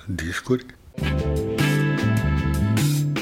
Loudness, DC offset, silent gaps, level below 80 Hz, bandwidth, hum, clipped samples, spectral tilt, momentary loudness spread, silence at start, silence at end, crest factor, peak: -23 LUFS; under 0.1%; none; -32 dBFS; 16.5 kHz; none; under 0.1%; -6 dB/octave; 7 LU; 0.05 s; 0 s; 14 dB; -8 dBFS